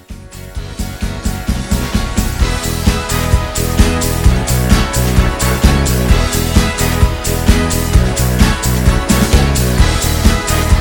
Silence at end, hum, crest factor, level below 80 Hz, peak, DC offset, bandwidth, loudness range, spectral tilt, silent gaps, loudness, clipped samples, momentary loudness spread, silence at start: 0 s; none; 12 dB; -16 dBFS; 0 dBFS; under 0.1%; 19.5 kHz; 4 LU; -4.5 dB/octave; none; -14 LUFS; 0.7%; 8 LU; 0.1 s